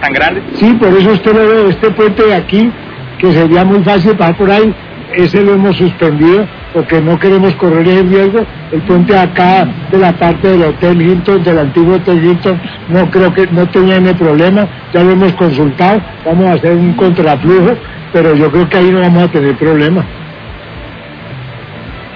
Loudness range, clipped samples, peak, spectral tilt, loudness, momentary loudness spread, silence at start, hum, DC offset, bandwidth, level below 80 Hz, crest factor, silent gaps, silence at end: 1 LU; 3%; 0 dBFS; -9 dB/octave; -8 LUFS; 10 LU; 0 s; none; under 0.1%; 5.4 kHz; -36 dBFS; 8 dB; none; 0 s